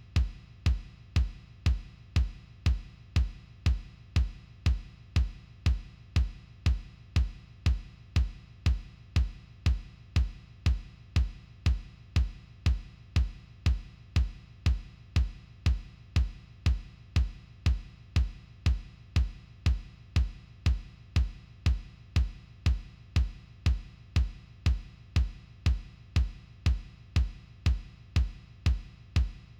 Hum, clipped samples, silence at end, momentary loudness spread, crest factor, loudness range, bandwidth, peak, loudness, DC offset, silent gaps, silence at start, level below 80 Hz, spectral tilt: none; under 0.1%; 0.2 s; 5 LU; 14 dB; 0 LU; 9.2 kHz; -16 dBFS; -33 LUFS; under 0.1%; none; 0.15 s; -32 dBFS; -6 dB/octave